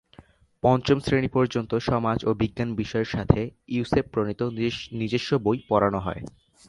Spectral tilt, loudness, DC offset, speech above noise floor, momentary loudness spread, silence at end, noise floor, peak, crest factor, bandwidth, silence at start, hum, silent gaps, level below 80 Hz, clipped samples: -7 dB/octave; -25 LUFS; under 0.1%; 29 dB; 7 LU; 0.4 s; -53 dBFS; -2 dBFS; 24 dB; 11.5 kHz; 0.65 s; none; none; -44 dBFS; under 0.1%